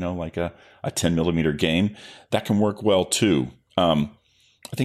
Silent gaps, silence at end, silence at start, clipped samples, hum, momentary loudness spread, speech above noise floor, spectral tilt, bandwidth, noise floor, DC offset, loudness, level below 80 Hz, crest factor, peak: none; 0 s; 0 s; under 0.1%; none; 11 LU; 26 dB; -5 dB/octave; 15 kHz; -48 dBFS; under 0.1%; -23 LUFS; -48 dBFS; 18 dB; -4 dBFS